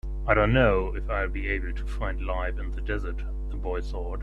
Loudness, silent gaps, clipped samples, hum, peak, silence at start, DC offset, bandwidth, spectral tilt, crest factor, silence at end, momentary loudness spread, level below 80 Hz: -28 LUFS; none; under 0.1%; none; -4 dBFS; 0.05 s; under 0.1%; 5.4 kHz; -8 dB/octave; 22 dB; 0 s; 12 LU; -30 dBFS